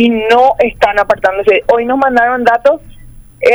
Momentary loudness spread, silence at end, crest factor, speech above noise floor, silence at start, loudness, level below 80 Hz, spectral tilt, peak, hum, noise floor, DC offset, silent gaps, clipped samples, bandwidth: 4 LU; 0 s; 10 dB; 24 dB; 0 s; -11 LUFS; -38 dBFS; -5 dB/octave; 0 dBFS; none; -34 dBFS; under 0.1%; none; under 0.1%; over 20 kHz